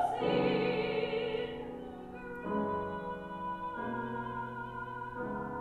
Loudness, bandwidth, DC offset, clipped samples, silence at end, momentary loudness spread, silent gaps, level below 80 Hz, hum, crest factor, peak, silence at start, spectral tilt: -36 LUFS; 12 kHz; under 0.1%; under 0.1%; 0 s; 12 LU; none; -60 dBFS; none; 16 dB; -20 dBFS; 0 s; -7 dB/octave